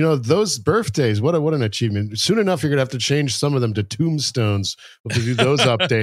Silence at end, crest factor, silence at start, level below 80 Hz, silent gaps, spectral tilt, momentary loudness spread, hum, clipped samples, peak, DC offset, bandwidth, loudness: 0 s; 18 dB; 0 s; -56 dBFS; 5.00-5.04 s; -5 dB/octave; 6 LU; none; under 0.1%; -2 dBFS; under 0.1%; 15 kHz; -19 LUFS